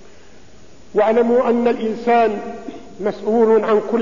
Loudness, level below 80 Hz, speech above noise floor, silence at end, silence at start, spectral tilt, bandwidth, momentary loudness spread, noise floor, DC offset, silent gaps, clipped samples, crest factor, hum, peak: -17 LUFS; -54 dBFS; 30 dB; 0 s; 0.95 s; -6.5 dB/octave; 7.4 kHz; 13 LU; -46 dBFS; 1%; none; under 0.1%; 12 dB; none; -6 dBFS